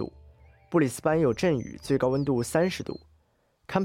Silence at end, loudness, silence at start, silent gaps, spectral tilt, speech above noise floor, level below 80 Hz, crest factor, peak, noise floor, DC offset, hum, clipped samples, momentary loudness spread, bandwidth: 0 s; -26 LUFS; 0 s; none; -6 dB/octave; 43 dB; -56 dBFS; 16 dB; -12 dBFS; -68 dBFS; under 0.1%; none; under 0.1%; 12 LU; 16 kHz